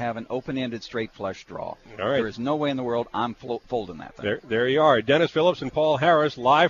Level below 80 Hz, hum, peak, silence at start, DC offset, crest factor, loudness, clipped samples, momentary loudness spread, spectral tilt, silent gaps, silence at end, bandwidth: -56 dBFS; none; -4 dBFS; 0 s; under 0.1%; 20 dB; -24 LUFS; under 0.1%; 14 LU; -6 dB/octave; none; 0 s; 7.4 kHz